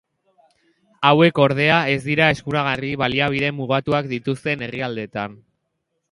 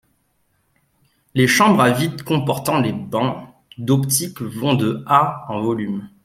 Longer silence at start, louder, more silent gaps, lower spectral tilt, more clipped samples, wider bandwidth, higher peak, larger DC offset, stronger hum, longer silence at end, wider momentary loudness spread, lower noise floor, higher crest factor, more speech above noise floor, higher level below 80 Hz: second, 1 s vs 1.35 s; about the same, -19 LUFS vs -18 LUFS; neither; first, -6.5 dB/octave vs -5 dB/octave; neither; second, 11.5 kHz vs 16 kHz; about the same, 0 dBFS vs -2 dBFS; neither; neither; first, 0.75 s vs 0.15 s; about the same, 12 LU vs 11 LU; first, -74 dBFS vs -65 dBFS; about the same, 20 dB vs 18 dB; first, 55 dB vs 47 dB; about the same, -54 dBFS vs -56 dBFS